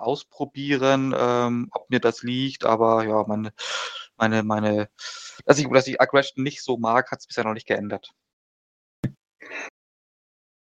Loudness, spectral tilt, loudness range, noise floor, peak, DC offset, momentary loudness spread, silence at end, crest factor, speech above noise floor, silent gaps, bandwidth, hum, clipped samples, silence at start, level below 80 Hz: -23 LUFS; -5 dB/octave; 7 LU; under -90 dBFS; -2 dBFS; under 0.1%; 14 LU; 1.05 s; 24 dB; over 67 dB; 8.33-9.03 s; 9.2 kHz; none; under 0.1%; 0 s; -64 dBFS